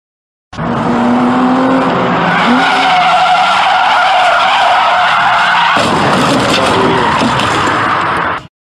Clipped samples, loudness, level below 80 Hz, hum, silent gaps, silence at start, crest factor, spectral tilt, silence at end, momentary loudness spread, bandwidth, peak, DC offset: under 0.1%; -9 LUFS; -42 dBFS; none; none; 0.55 s; 10 dB; -4.5 dB/octave; 0.25 s; 5 LU; 14 kHz; 0 dBFS; under 0.1%